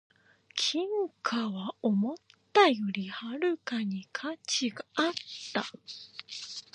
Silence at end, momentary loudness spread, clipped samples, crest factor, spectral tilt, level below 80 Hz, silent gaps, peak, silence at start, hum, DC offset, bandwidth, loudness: 0.15 s; 16 LU; under 0.1%; 24 dB; -4 dB/octave; -82 dBFS; none; -8 dBFS; 0.55 s; none; under 0.1%; 11 kHz; -31 LUFS